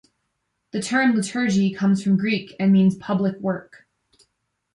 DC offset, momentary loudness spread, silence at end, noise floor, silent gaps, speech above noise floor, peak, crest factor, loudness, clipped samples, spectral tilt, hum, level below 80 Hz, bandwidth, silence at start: under 0.1%; 10 LU; 1.1 s; -75 dBFS; none; 55 dB; -8 dBFS; 14 dB; -21 LUFS; under 0.1%; -6 dB/octave; none; -64 dBFS; 11 kHz; 0.75 s